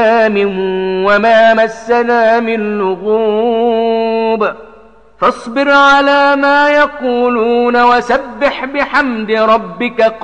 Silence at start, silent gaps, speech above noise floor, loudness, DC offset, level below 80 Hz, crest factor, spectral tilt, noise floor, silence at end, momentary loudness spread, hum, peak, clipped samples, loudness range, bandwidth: 0 s; none; 30 dB; -11 LUFS; under 0.1%; -46 dBFS; 10 dB; -5 dB/octave; -41 dBFS; 0 s; 8 LU; none; -2 dBFS; under 0.1%; 3 LU; 9.4 kHz